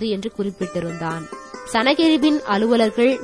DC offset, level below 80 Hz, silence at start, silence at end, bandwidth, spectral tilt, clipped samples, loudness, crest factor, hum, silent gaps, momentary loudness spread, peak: 0.1%; -54 dBFS; 0 s; 0 s; 11 kHz; -5 dB/octave; under 0.1%; -19 LUFS; 16 dB; none; none; 12 LU; -4 dBFS